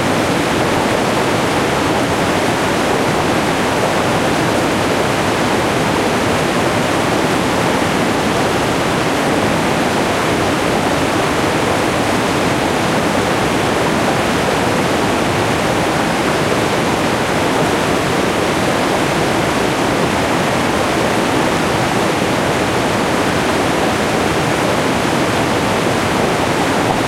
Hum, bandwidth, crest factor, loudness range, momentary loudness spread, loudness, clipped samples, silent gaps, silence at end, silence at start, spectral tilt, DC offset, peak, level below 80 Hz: none; 16.5 kHz; 14 dB; 0 LU; 0 LU; -15 LUFS; under 0.1%; none; 0 s; 0 s; -4.5 dB/octave; under 0.1%; -2 dBFS; -38 dBFS